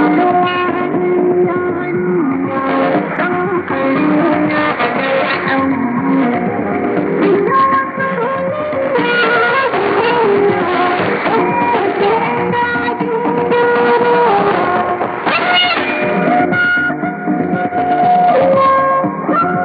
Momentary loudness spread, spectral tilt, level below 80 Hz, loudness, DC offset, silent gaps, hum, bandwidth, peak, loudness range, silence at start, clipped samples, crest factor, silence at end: 6 LU; -10.5 dB/octave; -54 dBFS; -13 LUFS; under 0.1%; none; none; 5 kHz; 0 dBFS; 2 LU; 0 s; under 0.1%; 12 dB; 0 s